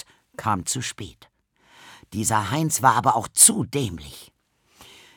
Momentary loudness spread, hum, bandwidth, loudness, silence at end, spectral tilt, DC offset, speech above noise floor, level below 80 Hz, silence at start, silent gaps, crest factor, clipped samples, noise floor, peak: 24 LU; none; over 20 kHz; -20 LUFS; 0.35 s; -3 dB/octave; under 0.1%; 38 dB; -56 dBFS; 0.4 s; none; 24 dB; under 0.1%; -60 dBFS; -2 dBFS